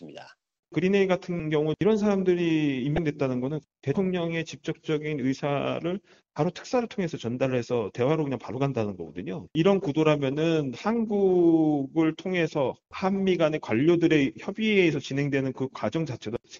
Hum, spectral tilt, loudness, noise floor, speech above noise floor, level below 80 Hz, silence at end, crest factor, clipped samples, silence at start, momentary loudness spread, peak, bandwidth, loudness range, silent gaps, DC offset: none; -6 dB/octave; -26 LUFS; -48 dBFS; 22 dB; -58 dBFS; 0 s; 18 dB; under 0.1%; 0 s; 9 LU; -8 dBFS; 7.4 kHz; 5 LU; 0.59-0.63 s; under 0.1%